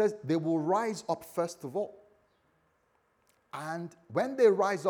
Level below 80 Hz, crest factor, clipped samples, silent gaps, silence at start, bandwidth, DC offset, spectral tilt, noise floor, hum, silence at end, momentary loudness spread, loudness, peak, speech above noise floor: -80 dBFS; 20 dB; under 0.1%; none; 0 s; 19.5 kHz; under 0.1%; -6 dB/octave; -72 dBFS; none; 0 s; 15 LU; -31 LUFS; -12 dBFS; 42 dB